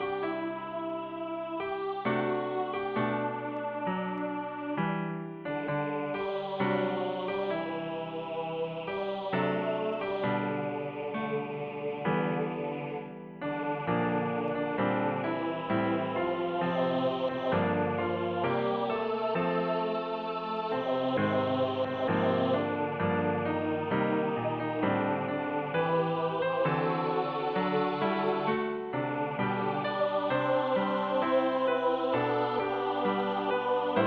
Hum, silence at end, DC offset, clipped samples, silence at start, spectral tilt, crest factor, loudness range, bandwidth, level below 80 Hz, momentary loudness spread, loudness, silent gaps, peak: none; 0 s; under 0.1%; under 0.1%; 0 s; -9 dB/octave; 16 dB; 4 LU; 6 kHz; -68 dBFS; 7 LU; -31 LUFS; none; -16 dBFS